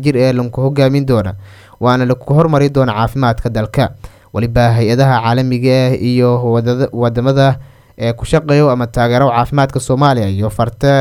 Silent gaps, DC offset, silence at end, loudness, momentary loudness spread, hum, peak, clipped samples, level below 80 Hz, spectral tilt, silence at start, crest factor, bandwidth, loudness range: none; under 0.1%; 0 s; -13 LUFS; 6 LU; none; 0 dBFS; under 0.1%; -34 dBFS; -7.5 dB/octave; 0 s; 12 dB; 14.5 kHz; 1 LU